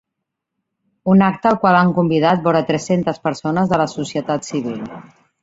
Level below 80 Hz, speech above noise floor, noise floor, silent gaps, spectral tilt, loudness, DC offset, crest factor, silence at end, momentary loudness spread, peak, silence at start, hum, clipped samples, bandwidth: -56 dBFS; 63 dB; -79 dBFS; none; -6.5 dB/octave; -17 LUFS; under 0.1%; 16 dB; 0.4 s; 10 LU; -2 dBFS; 1.05 s; none; under 0.1%; 7.8 kHz